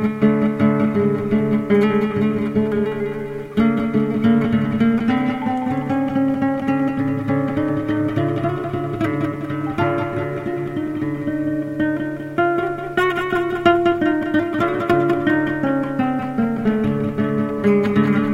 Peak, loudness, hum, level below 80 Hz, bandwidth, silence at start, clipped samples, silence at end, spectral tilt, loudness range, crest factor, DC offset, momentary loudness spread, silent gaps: -2 dBFS; -20 LUFS; none; -48 dBFS; 11.5 kHz; 0 s; under 0.1%; 0 s; -8.5 dB/octave; 4 LU; 16 dB; under 0.1%; 7 LU; none